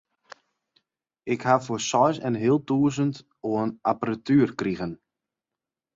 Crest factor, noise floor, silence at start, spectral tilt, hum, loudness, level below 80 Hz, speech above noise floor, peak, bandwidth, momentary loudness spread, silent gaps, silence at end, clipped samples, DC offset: 20 dB; -89 dBFS; 1.25 s; -6 dB/octave; none; -25 LUFS; -62 dBFS; 65 dB; -6 dBFS; 7.8 kHz; 11 LU; none; 1 s; under 0.1%; under 0.1%